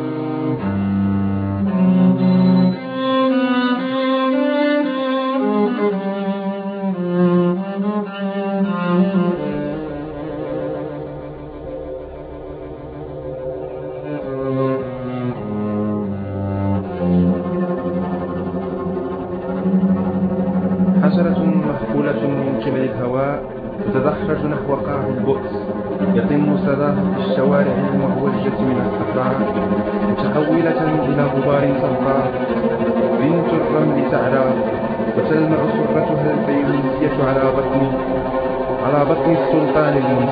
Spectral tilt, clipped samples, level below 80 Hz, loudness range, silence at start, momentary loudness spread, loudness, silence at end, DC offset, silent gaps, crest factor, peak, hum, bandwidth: -11.5 dB/octave; under 0.1%; -44 dBFS; 7 LU; 0 s; 10 LU; -18 LUFS; 0 s; under 0.1%; none; 16 dB; -2 dBFS; none; 4.9 kHz